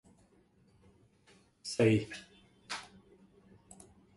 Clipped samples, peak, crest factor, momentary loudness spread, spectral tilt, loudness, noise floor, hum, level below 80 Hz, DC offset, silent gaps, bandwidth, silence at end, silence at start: under 0.1%; -16 dBFS; 24 dB; 28 LU; -6 dB/octave; -34 LUFS; -67 dBFS; none; -68 dBFS; under 0.1%; none; 11.5 kHz; 1.3 s; 1.65 s